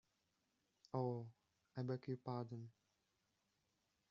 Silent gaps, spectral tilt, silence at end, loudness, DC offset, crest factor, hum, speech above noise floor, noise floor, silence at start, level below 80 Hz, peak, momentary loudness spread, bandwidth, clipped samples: none; -8.5 dB/octave; 1.4 s; -48 LUFS; under 0.1%; 22 dB; none; 40 dB; -86 dBFS; 0.95 s; -88 dBFS; -28 dBFS; 12 LU; 7 kHz; under 0.1%